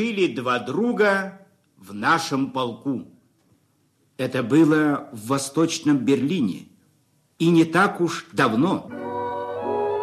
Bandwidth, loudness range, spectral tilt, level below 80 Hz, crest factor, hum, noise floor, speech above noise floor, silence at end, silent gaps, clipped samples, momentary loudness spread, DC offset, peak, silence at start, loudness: 13.5 kHz; 3 LU; -5.5 dB/octave; -68 dBFS; 16 dB; none; -65 dBFS; 43 dB; 0 s; none; under 0.1%; 11 LU; under 0.1%; -6 dBFS; 0 s; -22 LUFS